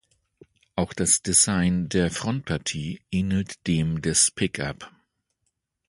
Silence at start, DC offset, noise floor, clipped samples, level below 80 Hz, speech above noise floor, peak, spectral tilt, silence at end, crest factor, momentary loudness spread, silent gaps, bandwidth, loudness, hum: 0.75 s; under 0.1%; -77 dBFS; under 0.1%; -46 dBFS; 53 dB; -4 dBFS; -3.5 dB/octave; 1 s; 20 dB; 13 LU; none; 11.5 kHz; -23 LUFS; none